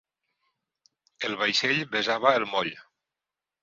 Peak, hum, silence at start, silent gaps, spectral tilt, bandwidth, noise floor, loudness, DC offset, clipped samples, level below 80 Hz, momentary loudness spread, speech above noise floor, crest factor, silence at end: -6 dBFS; none; 1.2 s; none; -3 dB/octave; 7.8 kHz; -89 dBFS; -25 LUFS; under 0.1%; under 0.1%; -72 dBFS; 10 LU; 63 dB; 24 dB; 0.8 s